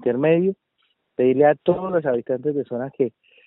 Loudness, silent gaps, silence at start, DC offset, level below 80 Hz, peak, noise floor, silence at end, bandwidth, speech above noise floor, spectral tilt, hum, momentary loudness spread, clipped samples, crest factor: -21 LUFS; none; 0 s; under 0.1%; -64 dBFS; -4 dBFS; -69 dBFS; 0.4 s; 4 kHz; 49 dB; -7 dB/octave; none; 10 LU; under 0.1%; 16 dB